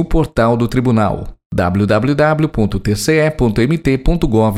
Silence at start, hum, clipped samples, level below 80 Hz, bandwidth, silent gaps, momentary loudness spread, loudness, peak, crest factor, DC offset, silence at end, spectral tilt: 0 s; none; under 0.1%; -24 dBFS; 15.5 kHz; 1.46-1.50 s; 4 LU; -15 LUFS; 0 dBFS; 14 dB; under 0.1%; 0 s; -7 dB/octave